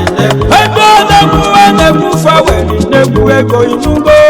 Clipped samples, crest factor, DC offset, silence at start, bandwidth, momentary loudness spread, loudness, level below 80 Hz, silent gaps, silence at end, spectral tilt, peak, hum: 4%; 6 dB; under 0.1%; 0 s; over 20 kHz; 5 LU; -6 LUFS; -22 dBFS; none; 0 s; -5 dB/octave; 0 dBFS; none